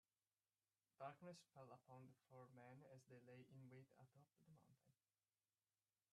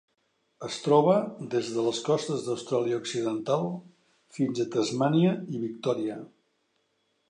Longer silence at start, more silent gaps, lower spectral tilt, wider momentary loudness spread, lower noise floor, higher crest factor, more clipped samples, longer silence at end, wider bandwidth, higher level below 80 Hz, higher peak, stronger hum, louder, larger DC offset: first, 1 s vs 0.6 s; neither; about the same, -6 dB/octave vs -6 dB/octave; second, 8 LU vs 12 LU; first, under -90 dBFS vs -74 dBFS; about the same, 22 dB vs 20 dB; neither; first, 1.2 s vs 1 s; second, 8.8 kHz vs 10.5 kHz; second, under -90 dBFS vs -76 dBFS; second, -44 dBFS vs -8 dBFS; neither; second, -65 LUFS vs -28 LUFS; neither